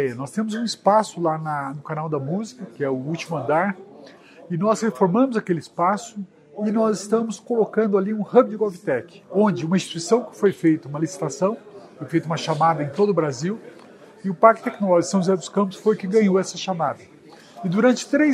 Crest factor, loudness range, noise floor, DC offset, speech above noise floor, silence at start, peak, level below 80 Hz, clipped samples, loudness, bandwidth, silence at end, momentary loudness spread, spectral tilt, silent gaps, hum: 22 dB; 4 LU; -46 dBFS; under 0.1%; 25 dB; 0 s; 0 dBFS; -70 dBFS; under 0.1%; -22 LUFS; 12.5 kHz; 0 s; 10 LU; -6 dB/octave; none; none